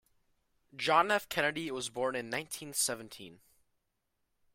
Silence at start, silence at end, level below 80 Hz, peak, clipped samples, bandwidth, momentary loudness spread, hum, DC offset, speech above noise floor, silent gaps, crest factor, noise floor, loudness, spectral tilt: 0.75 s; 1.2 s; -74 dBFS; -12 dBFS; under 0.1%; 16 kHz; 21 LU; none; under 0.1%; 48 dB; none; 24 dB; -81 dBFS; -32 LUFS; -2 dB/octave